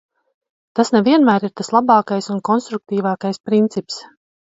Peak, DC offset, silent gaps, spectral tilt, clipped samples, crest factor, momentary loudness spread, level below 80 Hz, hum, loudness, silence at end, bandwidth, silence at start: 0 dBFS; under 0.1%; 3.40-3.44 s; -6 dB/octave; under 0.1%; 18 dB; 11 LU; -64 dBFS; none; -17 LUFS; 0.5 s; 7.8 kHz; 0.75 s